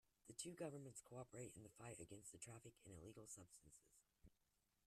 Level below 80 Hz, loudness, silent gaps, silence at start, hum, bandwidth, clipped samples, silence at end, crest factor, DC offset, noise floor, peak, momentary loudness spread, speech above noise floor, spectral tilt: -82 dBFS; -58 LUFS; none; 0.25 s; none; 13.5 kHz; under 0.1%; 0.55 s; 24 dB; under 0.1%; -87 dBFS; -36 dBFS; 9 LU; 28 dB; -4 dB/octave